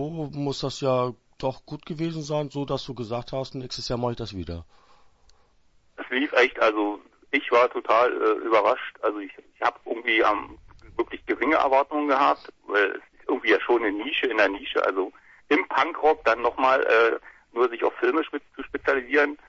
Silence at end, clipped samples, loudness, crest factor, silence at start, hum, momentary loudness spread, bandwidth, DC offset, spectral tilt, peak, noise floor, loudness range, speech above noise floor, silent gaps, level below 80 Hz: 0.1 s; under 0.1%; -24 LUFS; 18 dB; 0 s; none; 13 LU; 8 kHz; under 0.1%; -5.5 dB/octave; -6 dBFS; -60 dBFS; 8 LU; 36 dB; none; -54 dBFS